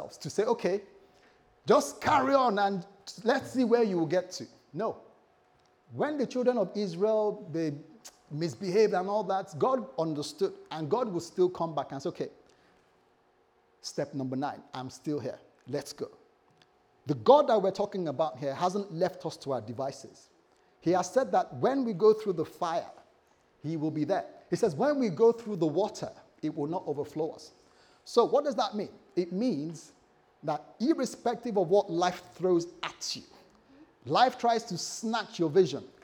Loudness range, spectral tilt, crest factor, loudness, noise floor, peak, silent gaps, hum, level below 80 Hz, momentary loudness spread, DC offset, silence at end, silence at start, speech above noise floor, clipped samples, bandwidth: 7 LU; -5.5 dB/octave; 24 dB; -30 LUFS; -67 dBFS; -8 dBFS; none; none; -74 dBFS; 15 LU; under 0.1%; 0.15 s; 0 s; 38 dB; under 0.1%; 16.5 kHz